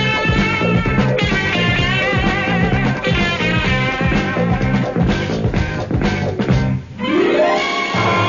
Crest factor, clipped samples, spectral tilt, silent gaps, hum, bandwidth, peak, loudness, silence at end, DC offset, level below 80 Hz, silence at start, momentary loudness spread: 14 dB; under 0.1%; -6 dB/octave; none; none; 7.4 kHz; -2 dBFS; -16 LUFS; 0 s; under 0.1%; -28 dBFS; 0 s; 4 LU